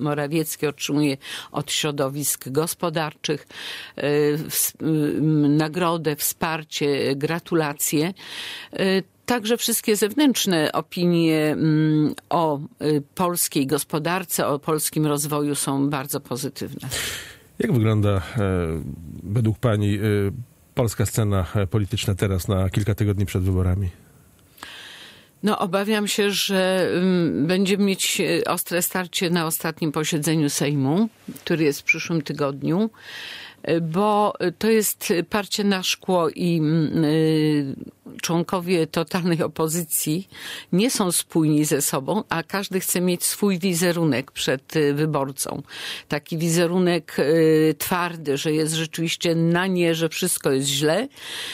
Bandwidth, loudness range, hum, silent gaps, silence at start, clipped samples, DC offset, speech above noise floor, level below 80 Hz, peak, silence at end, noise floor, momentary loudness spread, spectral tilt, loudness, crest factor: 16 kHz; 3 LU; none; none; 0 s; under 0.1%; under 0.1%; 31 dB; -54 dBFS; -6 dBFS; 0 s; -53 dBFS; 9 LU; -4.5 dB/octave; -22 LUFS; 16 dB